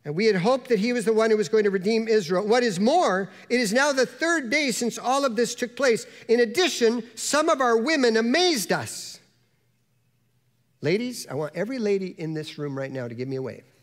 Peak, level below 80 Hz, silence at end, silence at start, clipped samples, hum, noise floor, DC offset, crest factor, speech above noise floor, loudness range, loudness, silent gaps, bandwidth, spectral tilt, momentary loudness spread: -8 dBFS; -74 dBFS; 0.25 s; 0.05 s; under 0.1%; none; -68 dBFS; under 0.1%; 16 dB; 45 dB; 8 LU; -23 LUFS; none; 16 kHz; -4 dB/octave; 11 LU